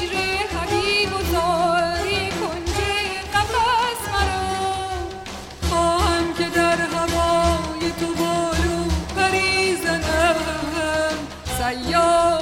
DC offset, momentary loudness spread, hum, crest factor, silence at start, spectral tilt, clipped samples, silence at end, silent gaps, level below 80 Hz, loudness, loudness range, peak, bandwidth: under 0.1%; 6 LU; none; 16 dB; 0 s; -4 dB/octave; under 0.1%; 0 s; none; -32 dBFS; -21 LUFS; 2 LU; -6 dBFS; 16.5 kHz